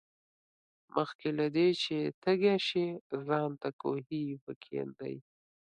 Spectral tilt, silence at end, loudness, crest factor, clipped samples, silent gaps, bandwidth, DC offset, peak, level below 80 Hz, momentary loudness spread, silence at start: -6.5 dB/octave; 0.6 s; -33 LUFS; 20 dB; under 0.1%; 1.15-1.19 s, 2.14-2.22 s, 3.01-3.10 s, 3.73-3.79 s, 4.41-4.47 s, 4.56-4.61 s; 9.6 kHz; under 0.1%; -14 dBFS; -78 dBFS; 12 LU; 0.95 s